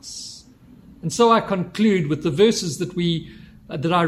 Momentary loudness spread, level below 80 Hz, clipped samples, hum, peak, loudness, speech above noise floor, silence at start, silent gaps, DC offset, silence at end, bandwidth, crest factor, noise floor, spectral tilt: 17 LU; -52 dBFS; under 0.1%; none; -4 dBFS; -20 LUFS; 28 dB; 0.05 s; none; under 0.1%; 0 s; 14 kHz; 18 dB; -47 dBFS; -5.5 dB/octave